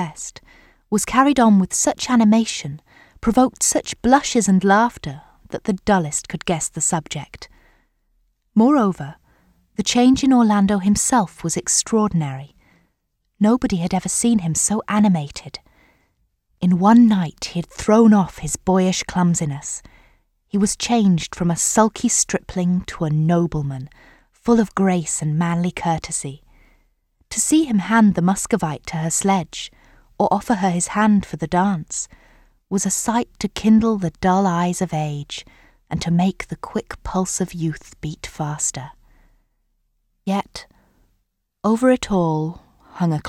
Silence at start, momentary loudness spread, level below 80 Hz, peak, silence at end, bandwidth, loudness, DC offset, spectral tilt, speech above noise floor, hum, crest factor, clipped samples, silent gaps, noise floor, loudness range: 0 s; 16 LU; -46 dBFS; 0 dBFS; 0 s; 15 kHz; -19 LUFS; under 0.1%; -5 dB/octave; 52 dB; none; 18 dB; under 0.1%; none; -71 dBFS; 6 LU